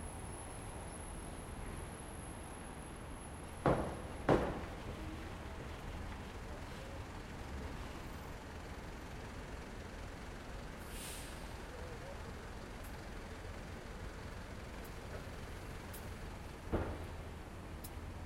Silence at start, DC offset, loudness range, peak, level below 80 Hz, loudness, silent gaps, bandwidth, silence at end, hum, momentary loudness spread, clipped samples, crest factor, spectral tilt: 0 s; under 0.1%; 9 LU; -16 dBFS; -52 dBFS; -45 LUFS; none; 16.5 kHz; 0 s; none; 8 LU; under 0.1%; 28 dB; -5.5 dB/octave